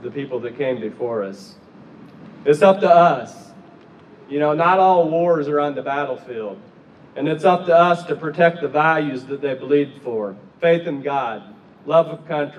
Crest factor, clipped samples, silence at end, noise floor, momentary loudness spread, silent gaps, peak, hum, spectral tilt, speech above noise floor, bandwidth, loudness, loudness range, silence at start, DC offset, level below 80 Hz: 18 dB; under 0.1%; 0 s; -45 dBFS; 14 LU; none; -2 dBFS; none; -7 dB/octave; 27 dB; 10.5 kHz; -19 LUFS; 4 LU; 0 s; under 0.1%; -70 dBFS